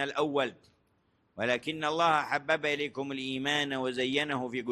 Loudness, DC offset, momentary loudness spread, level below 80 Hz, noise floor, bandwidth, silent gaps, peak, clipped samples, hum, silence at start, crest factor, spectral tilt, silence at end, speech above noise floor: -30 LUFS; under 0.1%; 8 LU; -72 dBFS; -72 dBFS; 12.5 kHz; none; -12 dBFS; under 0.1%; none; 0 s; 20 dB; -4 dB/octave; 0 s; 41 dB